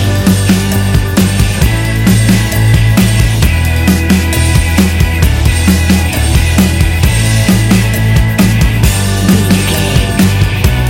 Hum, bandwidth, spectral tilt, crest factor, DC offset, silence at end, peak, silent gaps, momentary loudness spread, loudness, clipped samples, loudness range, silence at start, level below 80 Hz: none; 17.5 kHz; -5 dB/octave; 8 dB; under 0.1%; 0 s; 0 dBFS; none; 2 LU; -10 LUFS; 0.2%; 0 LU; 0 s; -16 dBFS